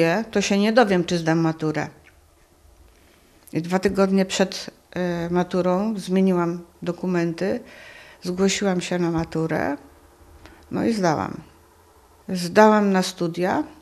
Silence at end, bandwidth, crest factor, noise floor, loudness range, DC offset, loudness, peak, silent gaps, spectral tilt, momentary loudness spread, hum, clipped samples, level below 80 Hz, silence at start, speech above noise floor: 0.1 s; 13.5 kHz; 20 dB; -55 dBFS; 4 LU; under 0.1%; -22 LUFS; -2 dBFS; none; -5.5 dB/octave; 14 LU; none; under 0.1%; -54 dBFS; 0 s; 34 dB